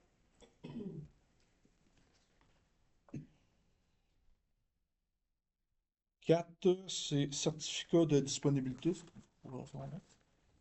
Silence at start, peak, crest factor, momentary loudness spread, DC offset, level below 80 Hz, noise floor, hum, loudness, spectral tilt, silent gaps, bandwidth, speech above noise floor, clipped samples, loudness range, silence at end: 0.65 s; -18 dBFS; 22 dB; 20 LU; under 0.1%; -70 dBFS; -87 dBFS; none; -36 LUFS; -5.5 dB/octave; none; 8.2 kHz; 52 dB; under 0.1%; 20 LU; 0.6 s